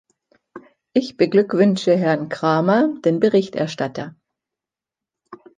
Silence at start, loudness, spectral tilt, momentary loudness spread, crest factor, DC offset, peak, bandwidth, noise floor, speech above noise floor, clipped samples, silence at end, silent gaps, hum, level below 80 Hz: 0.55 s; -19 LUFS; -7 dB/octave; 9 LU; 18 dB; under 0.1%; -4 dBFS; 9.4 kHz; -88 dBFS; 70 dB; under 0.1%; 0.25 s; none; none; -66 dBFS